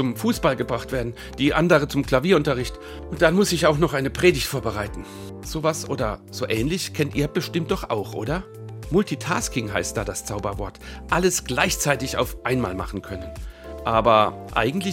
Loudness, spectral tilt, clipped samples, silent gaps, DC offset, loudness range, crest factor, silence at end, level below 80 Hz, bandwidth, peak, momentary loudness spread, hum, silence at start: -23 LUFS; -4.5 dB/octave; under 0.1%; none; under 0.1%; 5 LU; 22 dB; 0 s; -38 dBFS; 17 kHz; 0 dBFS; 14 LU; none; 0 s